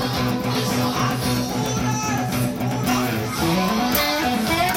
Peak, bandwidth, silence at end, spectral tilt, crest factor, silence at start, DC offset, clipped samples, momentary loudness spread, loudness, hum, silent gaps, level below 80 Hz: -2 dBFS; 17 kHz; 0 s; -4.5 dB/octave; 20 dB; 0 s; under 0.1%; under 0.1%; 4 LU; -21 LUFS; none; none; -42 dBFS